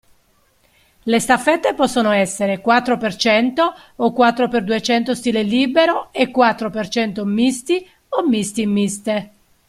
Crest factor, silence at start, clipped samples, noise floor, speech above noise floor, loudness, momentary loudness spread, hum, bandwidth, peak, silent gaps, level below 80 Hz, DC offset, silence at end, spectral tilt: 18 dB; 1.05 s; under 0.1%; -59 dBFS; 42 dB; -17 LUFS; 6 LU; none; 14.5 kHz; 0 dBFS; none; -54 dBFS; under 0.1%; 0.4 s; -4 dB/octave